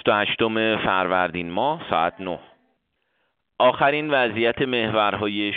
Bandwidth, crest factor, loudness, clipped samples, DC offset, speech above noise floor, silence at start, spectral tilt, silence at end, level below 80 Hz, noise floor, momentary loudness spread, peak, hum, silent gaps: 4.7 kHz; 18 dB; -21 LUFS; under 0.1%; under 0.1%; 50 dB; 0.05 s; -2.5 dB/octave; 0 s; -58 dBFS; -72 dBFS; 5 LU; -4 dBFS; none; none